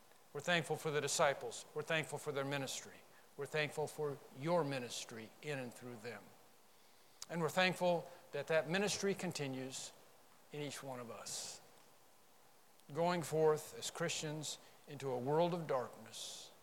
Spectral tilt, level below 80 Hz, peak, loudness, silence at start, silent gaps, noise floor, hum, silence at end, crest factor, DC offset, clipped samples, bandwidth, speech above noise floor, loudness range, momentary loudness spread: -4 dB/octave; -86 dBFS; -18 dBFS; -40 LUFS; 0.35 s; none; -68 dBFS; none; 0.1 s; 24 dB; under 0.1%; under 0.1%; 18 kHz; 28 dB; 6 LU; 15 LU